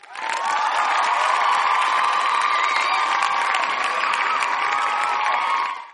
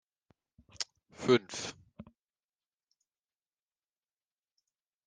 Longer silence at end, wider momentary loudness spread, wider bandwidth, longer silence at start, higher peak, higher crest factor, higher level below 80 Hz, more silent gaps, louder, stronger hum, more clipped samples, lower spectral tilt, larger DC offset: second, 0 s vs 3.05 s; second, 3 LU vs 14 LU; first, 11.5 kHz vs 10 kHz; second, 0.05 s vs 0.8 s; first, -4 dBFS vs -14 dBFS; second, 16 dB vs 26 dB; about the same, -78 dBFS vs -74 dBFS; neither; first, -20 LUFS vs -33 LUFS; neither; neither; second, 1 dB/octave vs -4 dB/octave; neither